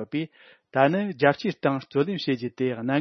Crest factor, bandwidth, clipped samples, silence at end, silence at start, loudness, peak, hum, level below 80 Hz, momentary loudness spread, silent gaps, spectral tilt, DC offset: 22 dB; 6.4 kHz; under 0.1%; 0 s; 0 s; -25 LUFS; -4 dBFS; none; -72 dBFS; 9 LU; none; -7.5 dB/octave; under 0.1%